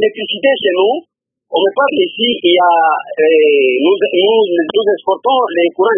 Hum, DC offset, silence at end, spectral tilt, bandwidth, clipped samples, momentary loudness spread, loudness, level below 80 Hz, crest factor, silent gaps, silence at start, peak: none; under 0.1%; 0 s; -9.5 dB/octave; 3.7 kHz; under 0.1%; 5 LU; -12 LUFS; -64 dBFS; 12 dB; none; 0 s; 0 dBFS